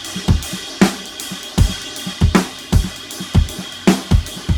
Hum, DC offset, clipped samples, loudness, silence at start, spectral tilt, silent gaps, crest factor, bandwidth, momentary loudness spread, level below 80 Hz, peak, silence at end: none; under 0.1%; under 0.1%; -19 LUFS; 0 s; -5 dB/octave; none; 16 dB; 19.5 kHz; 10 LU; -24 dBFS; 0 dBFS; 0 s